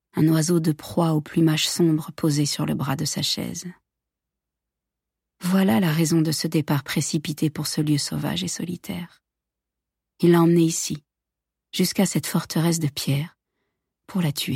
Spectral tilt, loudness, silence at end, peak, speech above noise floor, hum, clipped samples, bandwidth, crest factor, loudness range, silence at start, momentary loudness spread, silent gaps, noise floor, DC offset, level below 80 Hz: -5 dB/octave; -22 LUFS; 0 s; -6 dBFS; 64 dB; none; under 0.1%; 16.5 kHz; 16 dB; 5 LU; 0.15 s; 12 LU; none; -86 dBFS; under 0.1%; -60 dBFS